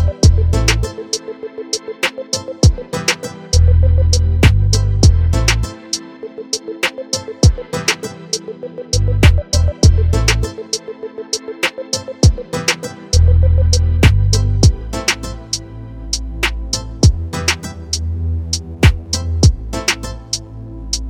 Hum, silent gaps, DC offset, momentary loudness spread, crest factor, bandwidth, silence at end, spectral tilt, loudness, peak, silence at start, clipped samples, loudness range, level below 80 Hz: none; none; under 0.1%; 11 LU; 14 dB; 15 kHz; 0 s; -4.5 dB/octave; -16 LUFS; 0 dBFS; 0 s; under 0.1%; 5 LU; -20 dBFS